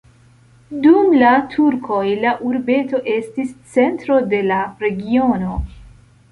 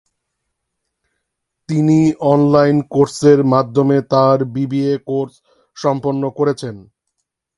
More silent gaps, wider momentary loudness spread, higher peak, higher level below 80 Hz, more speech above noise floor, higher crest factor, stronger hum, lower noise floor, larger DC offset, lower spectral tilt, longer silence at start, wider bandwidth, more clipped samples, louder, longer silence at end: neither; about the same, 12 LU vs 10 LU; about the same, -2 dBFS vs 0 dBFS; first, -38 dBFS vs -56 dBFS; second, 33 dB vs 61 dB; about the same, 16 dB vs 16 dB; neither; second, -49 dBFS vs -75 dBFS; neither; about the same, -7.5 dB/octave vs -7.5 dB/octave; second, 0.7 s vs 1.7 s; about the same, 11 kHz vs 11.5 kHz; neither; about the same, -16 LUFS vs -15 LUFS; second, 0.45 s vs 0.75 s